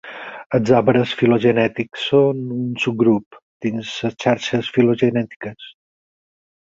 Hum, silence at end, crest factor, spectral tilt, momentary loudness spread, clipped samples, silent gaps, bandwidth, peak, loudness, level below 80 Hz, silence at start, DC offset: none; 0.95 s; 18 dB; -6.5 dB/octave; 13 LU; under 0.1%; 0.46-0.50 s, 3.26-3.31 s, 3.42-3.60 s, 5.36-5.40 s; 7.8 kHz; -2 dBFS; -18 LUFS; -56 dBFS; 0.05 s; under 0.1%